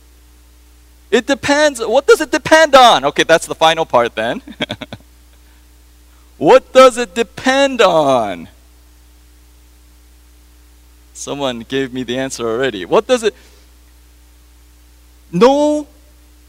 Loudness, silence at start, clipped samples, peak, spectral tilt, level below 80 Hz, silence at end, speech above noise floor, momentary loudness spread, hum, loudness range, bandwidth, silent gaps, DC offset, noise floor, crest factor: -13 LUFS; 1.1 s; 0.2%; 0 dBFS; -3.5 dB/octave; -44 dBFS; 0.65 s; 32 dB; 15 LU; 60 Hz at -45 dBFS; 13 LU; 16 kHz; none; under 0.1%; -45 dBFS; 16 dB